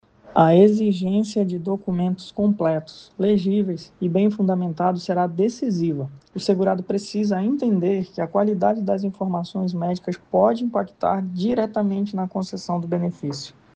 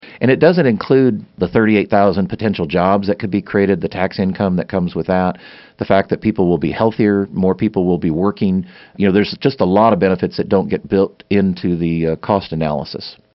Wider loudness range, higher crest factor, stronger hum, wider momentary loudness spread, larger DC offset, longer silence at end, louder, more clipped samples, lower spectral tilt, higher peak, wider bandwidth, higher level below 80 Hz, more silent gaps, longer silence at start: about the same, 2 LU vs 2 LU; about the same, 18 dB vs 16 dB; neither; about the same, 8 LU vs 7 LU; neither; about the same, 0.25 s vs 0.25 s; second, -22 LUFS vs -16 LUFS; neither; about the same, -7.5 dB/octave vs -6.5 dB/octave; second, -4 dBFS vs 0 dBFS; first, 8.8 kHz vs 5.8 kHz; second, -62 dBFS vs -46 dBFS; neither; first, 0.25 s vs 0.05 s